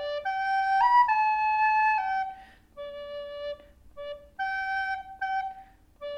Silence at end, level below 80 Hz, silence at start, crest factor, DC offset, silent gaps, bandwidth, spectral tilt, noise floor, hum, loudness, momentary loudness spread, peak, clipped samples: 0 s; -60 dBFS; 0 s; 16 dB; under 0.1%; none; 9 kHz; -2.5 dB/octave; -51 dBFS; none; -26 LUFS; 20 LU; -12 dBFS; under 0.1%